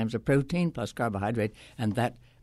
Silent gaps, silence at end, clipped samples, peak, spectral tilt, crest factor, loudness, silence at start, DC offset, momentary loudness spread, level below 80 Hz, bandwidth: none; 0.25 s; under 0.1%; -14 dBFS; -7 dB/octave; 16 dB; -30 LUFS; 0 s; under 0.1%; 6 LU; -54 dBFS; 13 kHz